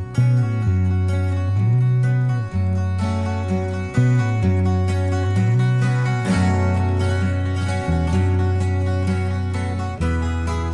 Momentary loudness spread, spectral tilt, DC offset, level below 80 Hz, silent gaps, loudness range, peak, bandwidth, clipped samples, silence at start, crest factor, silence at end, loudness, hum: 5 LU; -7.5 dB/octave; under 0.1%; -40 dBFS; none; 2 LU; -6 dBFS; 10.5 kHz; under 0.1%; 0 s; 12 dB; 0 s; -20 LUFS; none